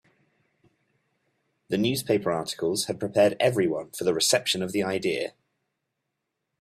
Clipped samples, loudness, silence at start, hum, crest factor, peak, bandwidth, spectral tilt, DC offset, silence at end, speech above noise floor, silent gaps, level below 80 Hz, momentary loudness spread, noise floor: under 0.1%; -25 LUFS; 1.7 s; none; 20 dB; -8 dBFS; 15.5 kHz; -3.5 dB/octave; under 0.1%; 1.3 s; 57 dB; none; -66 dBFS; 7 LU; -82 dBFS